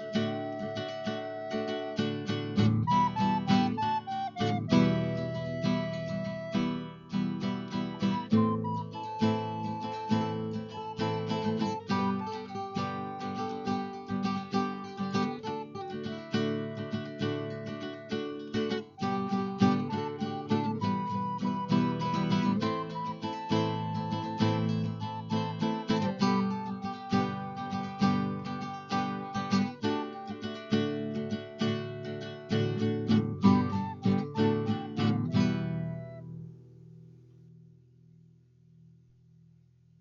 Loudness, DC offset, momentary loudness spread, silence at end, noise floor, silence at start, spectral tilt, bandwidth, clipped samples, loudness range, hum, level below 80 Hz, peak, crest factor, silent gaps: -32 LUFS; under 0.1%; 10 LU; 2.55 s; -61 dBFS; 0 s; -7 dB/octave; 7.2 kHz; under 0.1%; 5 LU; none; -64 dBFS; -10 dBFS; 20 dB; none